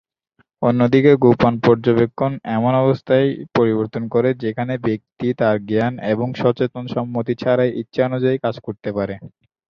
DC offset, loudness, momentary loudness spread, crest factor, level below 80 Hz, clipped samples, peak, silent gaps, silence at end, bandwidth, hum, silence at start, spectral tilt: under 0.1%; -18 LUFS; 10 LU; 16 dB; -52 dBFS; under 0.1%; -2 dBFS; none; 0.45 s; 6.6 kHz; none; 0.6 s; -9 dB/octave